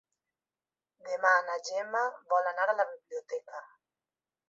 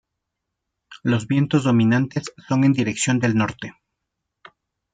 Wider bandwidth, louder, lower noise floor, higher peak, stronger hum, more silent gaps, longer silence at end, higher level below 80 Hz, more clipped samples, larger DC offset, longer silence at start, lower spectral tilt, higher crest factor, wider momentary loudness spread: second, 7.8 kHz vs 9.4 kHz; second, -31 LUFS vs -20 LUFS; first, under -90 dBFS vs -81 dBFS; second, -12 dBFS vs -6 dBFS; neither; neither; second, 0.85 s vs 1.25 s; second, under -90 dBFS vs -60 dBFS; neither; neither; first, 1.05 s vs 0.9 s; second, 0 dB/octave vs -6 dB/octave; first, 22 dB vs 16 dB; first, 17 LU vs 11 LU